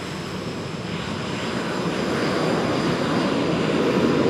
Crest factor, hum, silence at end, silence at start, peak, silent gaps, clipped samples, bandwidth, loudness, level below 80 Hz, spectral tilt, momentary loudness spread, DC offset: 16 dB; none; 0 s; 0 s; -6 dBFS; none; under 0.1%; 15 kHz; -23 LUFS; -50 dBFS; -5.5 dB/octave; 9 LU; under 0.1%